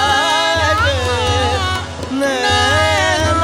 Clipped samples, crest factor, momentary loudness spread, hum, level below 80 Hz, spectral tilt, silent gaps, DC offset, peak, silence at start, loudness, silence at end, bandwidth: under 0.1%; 12 dB; 7 LU; none; -34 dBFS; -3.5 dB/octave; none; under 0.1%; -4 dBFS; 0 s; -14 LUFS; 0 s; 16 kHz